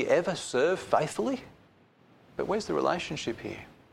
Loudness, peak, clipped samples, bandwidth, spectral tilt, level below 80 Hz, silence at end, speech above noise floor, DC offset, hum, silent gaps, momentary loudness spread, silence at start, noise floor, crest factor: -30 LUFS; -10 dBFS; under 0.1%; 15 kHz; -4.5 dB/octave; -62 dBFS; 0.2 s; 31 dB; under 0.1%; none; none; 12 LU; 0 s; -61 dBFS; 22 dB